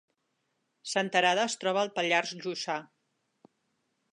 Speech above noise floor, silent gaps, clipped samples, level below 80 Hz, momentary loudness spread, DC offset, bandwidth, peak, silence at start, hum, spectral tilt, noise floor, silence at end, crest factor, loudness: 50 dB; none; under 0.1%; -86 dBFS; 10 LU; under 0.1%; 11 kHz; -10 dBFS; 0.85 s; none; -2.5 dB/octave; -79 dBFS; 1.3 s; 22 dB; -29 LUFS